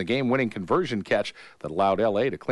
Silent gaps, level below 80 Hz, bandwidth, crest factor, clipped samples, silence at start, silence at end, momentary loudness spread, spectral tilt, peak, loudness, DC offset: none; -60 dBFS; 11.5 kHz; 14 dB; under 0.1%; 0 s; 0 s; 10 LU; -6.5 dB/octave; -10 dBFS; -25 LUFS; under 0.1%